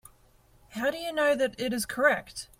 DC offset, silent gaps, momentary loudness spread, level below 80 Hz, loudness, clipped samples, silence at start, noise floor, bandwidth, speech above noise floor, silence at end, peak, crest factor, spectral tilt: under 0.1%; none; 6 LU; -60 dBFS; -27 LUFS; under 0.1%; 0.7 s; -61 dBFS; 16.5 kHz; 33 dB; 0.15 s; -10 dBFS; 20 dB; -3 dB/octave